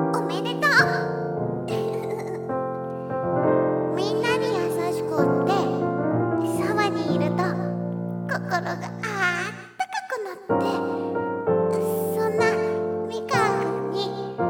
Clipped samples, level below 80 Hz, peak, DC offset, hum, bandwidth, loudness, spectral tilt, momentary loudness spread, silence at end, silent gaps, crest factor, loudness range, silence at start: under 0.1%; -66 dBFS; -4 dBFS; under 0.1%; none; 17.5 kHz; -24 LUFS; -6 dB/octave; 8 LU; 0 s; none; 20 dB; 3 LU; 0 s